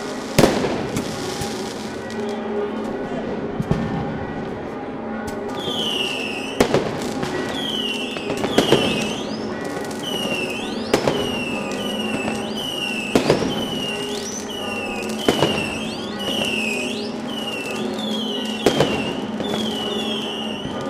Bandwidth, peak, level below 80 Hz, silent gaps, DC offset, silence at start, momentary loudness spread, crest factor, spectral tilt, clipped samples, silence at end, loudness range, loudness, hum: 16 kHz; 0 dBFS; -46 dBFS; none; under 0.1%; 0 s; 8 LU; 22 dB; -4 dB/octave; under 0.1%; 0 s; 4 LU; -23 LUFS; none